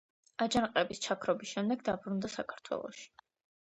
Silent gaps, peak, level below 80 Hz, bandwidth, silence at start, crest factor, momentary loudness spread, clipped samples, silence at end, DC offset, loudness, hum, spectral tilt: none; -14 dBFS; -66 dBFS; 8.8 kHz; 0.4 s; 22 dB; 15 LU; under 0.1%; 0.55 s; under 0.1%; -35 LUFS; none; -4 dB/octave